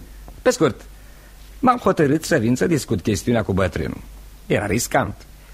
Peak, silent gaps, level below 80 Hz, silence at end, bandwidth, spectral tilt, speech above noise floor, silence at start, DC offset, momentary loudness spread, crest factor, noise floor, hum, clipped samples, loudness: -2 dBFS; none; -40 dBFS; 0 s; 16 kHz; -5.5 dB/octave; 23 dB; 0 s; under 0.1%; 11 LU; 18 dB; -42 dBFS; none; under 0.1%; -20 LUFS